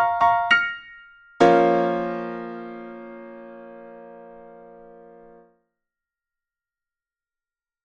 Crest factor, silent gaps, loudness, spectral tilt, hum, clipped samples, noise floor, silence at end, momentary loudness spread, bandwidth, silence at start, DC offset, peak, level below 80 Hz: 22 dB; none; -20 LUFS; -5.5 dB/octave; none; under 0.1%; under -90 dBFS; 3.4 s; 26 LU; 8.6 kHz; 0 s; under 0.1%; -4 dBFS; -62 dBFS